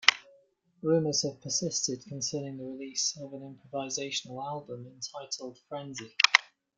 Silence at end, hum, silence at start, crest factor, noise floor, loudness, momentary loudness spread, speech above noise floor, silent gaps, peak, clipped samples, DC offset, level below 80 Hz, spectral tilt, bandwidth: 0.35 s; none; 0 s; 32 dB; -65 dBFS; -30 LUFS; 16 LU; 32 dB; none; 0 dBFS; under 0.1%; under 0.1%; -76 dBFS; -2 dB/octave; 11 kHz